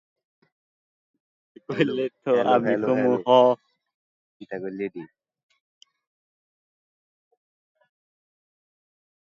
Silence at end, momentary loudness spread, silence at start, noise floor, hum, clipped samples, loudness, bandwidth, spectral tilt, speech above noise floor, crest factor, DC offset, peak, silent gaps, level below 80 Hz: 4.15 s; 16 LU; 1.7 s; under -90 dBFS; none; under 0.1%; -22 LUFS; 7.2 kHz; -7 dB/octave; over 68 dB; 22 dB; under 0.1%; -4 dBFS; 3.94-4.40 s; -76 dBFS